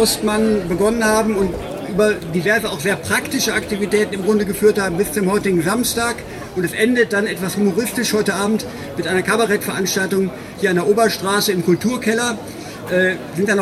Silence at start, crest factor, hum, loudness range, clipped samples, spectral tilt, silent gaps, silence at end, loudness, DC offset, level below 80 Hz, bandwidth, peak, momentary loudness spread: 0 s; 16 dB; none; 1 LU; under 0.1%; -4 dB/octave; none; 0 s; -18 LUFS; under 0.1%; -44 dBFS; 16 kHz; -2 dBFS; 6 LU